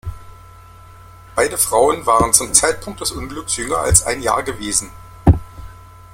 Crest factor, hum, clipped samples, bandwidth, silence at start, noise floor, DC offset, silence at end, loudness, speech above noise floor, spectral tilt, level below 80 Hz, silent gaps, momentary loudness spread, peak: 18 dB; none; under 0.1%; 16.5 kHz; 0.05 s; -41 dBFS; under 0.1%; 0.25 s; -16 LUFS; 24 dB; -3.5 dB/octave; -32 dBFS; none; 11 LU; 0 dBFS